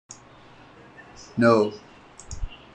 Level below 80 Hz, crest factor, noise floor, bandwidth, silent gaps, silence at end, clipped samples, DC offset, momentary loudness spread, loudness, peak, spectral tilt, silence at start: -44 dBFS; 20 dB; -49 dBFS; 9.8 kHz; none; 0.2 s; under 0.1%; under 0.1%; 26 LU; -22 LUFS; -6 dBFS; -6 dB/octave; 0.1 s